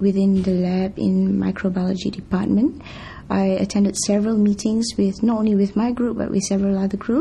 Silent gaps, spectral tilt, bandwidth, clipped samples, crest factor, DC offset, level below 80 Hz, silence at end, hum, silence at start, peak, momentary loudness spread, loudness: none; -6 dB/octave; 11.5 kHz; under 0.1%; 12 dB; under 0.1%; -44 dBFS; 0 s; none; 0 s; -8 dBFS; 5 LU; -20 LUFS